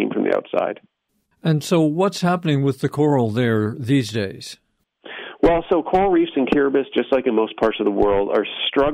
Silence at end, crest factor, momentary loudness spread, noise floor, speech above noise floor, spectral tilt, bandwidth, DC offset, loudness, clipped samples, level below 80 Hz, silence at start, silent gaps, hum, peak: 0 s; 14 dB; 9 LU; -67 dBFS; 48 dB; -6.5 dB/octave; 15 kHz; under 0.1%; -20 LUFS; under 0.1%; -44 dBFS; 0 s; none; none; -6 dBFS